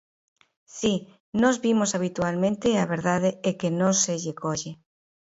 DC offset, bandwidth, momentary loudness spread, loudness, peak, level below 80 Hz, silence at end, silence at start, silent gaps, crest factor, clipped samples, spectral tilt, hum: under 0.1%; 8 kHz; 9 LU; -25 LUFS; -6 dBFS; -60 dBFS; 0.5 s; 0.75 s; 1.20-1.33 s; 20 dB; under 0.1%; -4.5 dB/octave; none